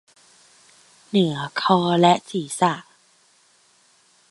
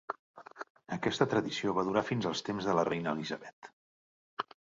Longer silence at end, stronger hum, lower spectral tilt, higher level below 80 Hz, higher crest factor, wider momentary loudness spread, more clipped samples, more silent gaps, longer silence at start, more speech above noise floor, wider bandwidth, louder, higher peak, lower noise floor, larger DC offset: first, 1.5 s vs 0.35 s; neither; about the same, -5.5 dB/octave vs -5.5 dB/octave; about the same, -70 dBFS vs -68 dBFS; about the same, 22 dB vs 24 dB; second, 8 LU vs 18 LU; neither; second, none vs 0.19-0.34 s, 0.70-0.75 s, 3.53-3.62 s, 3.73-4.37 s; first, 1.15 s vs 0.1 s; second, 39 dB vs over 58 dB; first, 11.5 kHz vs 7.8 kHz; first, -21 LUFS vs -33 LUFS; first, -2 dBFS vs -12 dBFS; second, -59 dBFS vs under -90 dBFS; neither